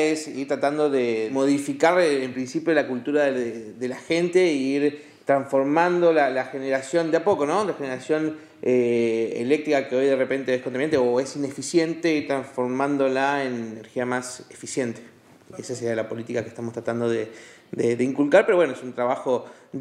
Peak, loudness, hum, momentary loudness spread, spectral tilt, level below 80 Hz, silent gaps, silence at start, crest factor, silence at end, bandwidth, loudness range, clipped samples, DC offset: -2 dBFS; -23 LUFS; none; 11 LU; -5 dB/octave; -74 dBFS; none; 0 s; 20 dB; 0 s; 12.5 kHz; 7 LU; under 0.1%; under 0.1%